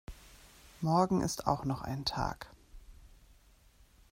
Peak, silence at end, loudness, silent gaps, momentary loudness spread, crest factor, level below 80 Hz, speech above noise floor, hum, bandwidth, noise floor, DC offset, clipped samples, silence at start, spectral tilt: -12 dBFS; 1.05 s; -33 LUFS; none; 24 LU; 24 dB; -52 dBFS; 30 dB; none; 16 kHz; -62 dBFS; under 0.1%; under 0.1%; 0.1 s; -5.5 dB/octave